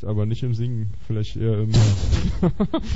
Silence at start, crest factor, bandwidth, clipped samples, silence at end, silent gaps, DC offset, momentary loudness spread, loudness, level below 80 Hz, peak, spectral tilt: 0 s; 16 dB; 8 kHz; under 0.1%; 0 s; none; 4%; 9 LU; -22 LUFS; -30 dBFS; -6 dBFS; -7 dB/octave